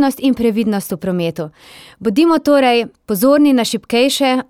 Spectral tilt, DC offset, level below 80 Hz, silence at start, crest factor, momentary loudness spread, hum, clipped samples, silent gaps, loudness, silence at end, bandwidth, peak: -5 dB/octave; under 0.1%; -52 dBFS; 0 s; 12 dB; 10 LU; none; under 0.1%; none; -15 LUFS; 0.05 s; 17 kHz; -2 dBFS